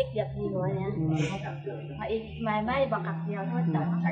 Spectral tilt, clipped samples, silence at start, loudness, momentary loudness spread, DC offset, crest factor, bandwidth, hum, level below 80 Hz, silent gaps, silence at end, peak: -8 dB/octave; under 0.1%; 0 s; -30 LUFS; 8 LU; under 0.1%; 14 dB; 8 kHz; none; -52 dBFS; none; 0 s; -16 dBFS